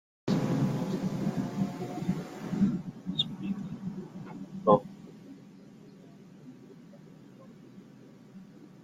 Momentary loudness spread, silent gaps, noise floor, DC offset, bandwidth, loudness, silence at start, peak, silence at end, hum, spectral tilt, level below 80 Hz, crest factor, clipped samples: 24 LU; none; -53 dBFS; under 0.1%; 15 kHz; -32 LUFS; 0.25 s; -8 dBFS; 0 s; none; -7 dB/octave; -64 dBFS; 26 dB; under 0.1%